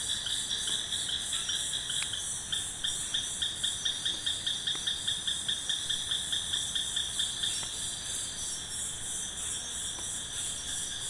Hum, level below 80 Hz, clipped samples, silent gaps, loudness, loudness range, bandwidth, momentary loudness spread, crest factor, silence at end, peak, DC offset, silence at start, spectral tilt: none; -56 dBFS; under 0.1%; none; -31 LUFS; 3 LU; 11.5 kHz; 4 LU; 18 dB; 0 s; -14 dBFS; under 0.1%; 0 s; 0.5 dB/octave